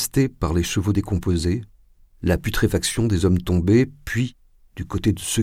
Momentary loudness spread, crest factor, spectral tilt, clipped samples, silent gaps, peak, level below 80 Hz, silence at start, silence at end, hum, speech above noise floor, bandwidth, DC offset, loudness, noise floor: 8 LU; 16 dB; -5.5 dB/octave; under 0.1%; none; -6 dBFS; -36 dBFS; 0 s; 0 s; none; 31 dB; 16.5 kHz; under 0.1%; -22 LUFS; -51 dBFS